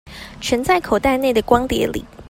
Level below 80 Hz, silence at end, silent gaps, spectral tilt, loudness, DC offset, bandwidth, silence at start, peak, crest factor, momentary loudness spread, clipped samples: -38 dBFS; 0.05 s; none; -4.5 dB/octave; -18 LUFS; under 0.1%; 16.5 kHz; 0.05 s; 0 dBFS; 18 dB; 8 LU; under 0.1%